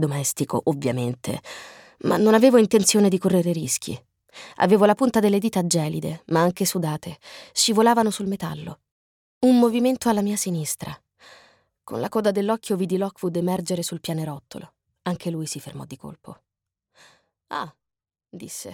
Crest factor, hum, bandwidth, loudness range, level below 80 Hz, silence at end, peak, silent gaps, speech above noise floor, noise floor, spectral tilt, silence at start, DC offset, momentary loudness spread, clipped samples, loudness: 20 dB; none; 18.5 kHz; 14 LU; -62 dBFS; 0 s; -4 dBFS; 8.91-9.41 s; 66 dB; -88 dBFS; -5 dB/octave; 0 s; under 0.1%; 21 LU; under 0.1%; -22 LUFS